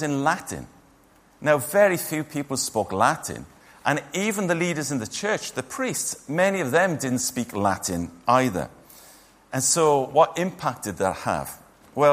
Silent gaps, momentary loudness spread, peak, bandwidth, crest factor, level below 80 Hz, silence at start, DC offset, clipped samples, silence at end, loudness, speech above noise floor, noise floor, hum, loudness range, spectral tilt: none; 11 LU; -4 dBFS; 15.5 kHz; 20 dB; -58 dBFS; 0 s; under 0.1%; under 0.1%; 0 s; -24 LUFS; 33 dB; -56 dBFS; none; 2 LU; -4 dB/octave